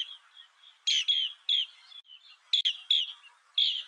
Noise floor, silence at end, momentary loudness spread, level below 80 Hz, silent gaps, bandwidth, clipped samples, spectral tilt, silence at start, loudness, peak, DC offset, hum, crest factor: -57 dBFS; 0 s; 17 LU; under -90 dBFS; none; 10.5 kHz; under 0.1%; 9 dB/octave; 0 s; -27 LUFS; -14 dBFS; under 0.1%; none; 18 dB